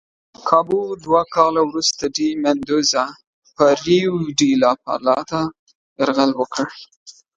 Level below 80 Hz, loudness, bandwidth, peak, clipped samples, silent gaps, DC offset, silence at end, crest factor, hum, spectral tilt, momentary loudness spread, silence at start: -56 dBFS; -18 LUFS; 9.2 kHz; 0 dBFS; under 0.1%; 3.27-3.42 s, 5.59-5.67 s, 5.75-5.96 s, 6.96-7.06 s; under 0.1%; 0.25 s; 18 dB; none; -4 dB/octave; 8 LU; 0.4 s